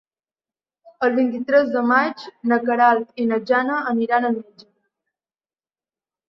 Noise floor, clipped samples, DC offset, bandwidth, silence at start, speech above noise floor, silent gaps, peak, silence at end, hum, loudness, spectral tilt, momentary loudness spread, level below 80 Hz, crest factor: under -90 dBFS; under 0.1%; under 0.1%; 6 kHz; 1 s; over 71 dB; none; -2 dBFS; 1.85 s; none; -20 LUFS; -7 dB/octave; 7 LU; -72 dBFS; 18 dB